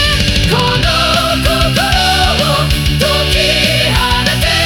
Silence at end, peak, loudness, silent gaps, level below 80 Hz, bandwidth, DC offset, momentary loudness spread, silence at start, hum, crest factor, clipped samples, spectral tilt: 0 s; 0 dBFS; -11 LUFS; none; -20 dBFS; 18 kHz; under 0.1%; 2 LU; 0 s; none; 12 dB; under 0.1%; -4 dB/octave